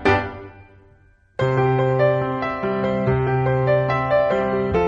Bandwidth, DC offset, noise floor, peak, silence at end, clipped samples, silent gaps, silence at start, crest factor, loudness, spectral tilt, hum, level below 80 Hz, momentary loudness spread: 7.4 kHz; under 0.1%; -54 dBFS; -4 dBFS; 0 s; under 0.1%; none; 0 s; 16 dB; -20 LUFS; -8.5 dB/octave; none; -42 dBFS; 5 LU